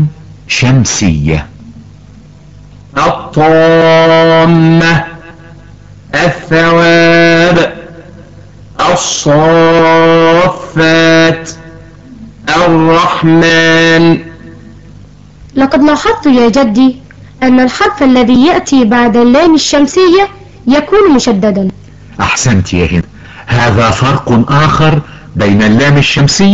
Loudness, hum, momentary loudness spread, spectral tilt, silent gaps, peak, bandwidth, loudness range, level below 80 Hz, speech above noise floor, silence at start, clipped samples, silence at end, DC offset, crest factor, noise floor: -7 LUFS; none; 10 LU; -5.5 dB/octave; none; 0 dBFS; 8.2 kHz; 3 LU; -32 dBFS; 28 dB; 0 s; under 0.1%; 0 s; under 0.1%; 8 dB; -34 dBFS